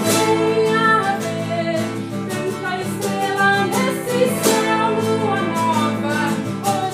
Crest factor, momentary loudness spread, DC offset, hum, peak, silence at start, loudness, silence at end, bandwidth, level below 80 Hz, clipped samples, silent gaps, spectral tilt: 16 dB; 7 LU; under 0.1%; none; -2 dBFS; 0 s; -19 LUFS; 0 s; 16 kHz; -60 dBFS; under 0.1%; none; -4.5 dB/octave